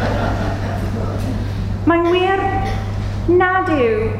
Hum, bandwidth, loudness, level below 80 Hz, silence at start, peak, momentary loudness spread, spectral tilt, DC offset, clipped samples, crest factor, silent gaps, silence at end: none; 11 kHz; -18 LUFS; -28 dBFS; 0 s; -2 dBFS; 8 LU; -7.5 dB/octave; under 0.1%; under 0.1%; 14 dB; none; 0 s